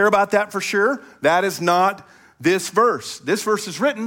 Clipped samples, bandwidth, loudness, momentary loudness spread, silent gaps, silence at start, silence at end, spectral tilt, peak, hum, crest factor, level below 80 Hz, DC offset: under 0.1%; 17 kHz; -19 LUFS; 6 LU; none; 0 s; 0 s; -4 dB/octave; -4 dBFS; none; 16 dB; -66 dBFS; under 0.1%